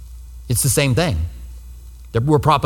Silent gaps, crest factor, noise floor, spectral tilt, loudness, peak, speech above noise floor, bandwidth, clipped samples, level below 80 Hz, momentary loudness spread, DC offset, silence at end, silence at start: none; 18 dB; -37 dBFS; -5 dB/octave; -18 LUFS; 0 dBFS; 20 dB; 18.5 kHz; under 0.1%; -32 dBFS; 23 LU; under 0.1%; 0 s; 0 s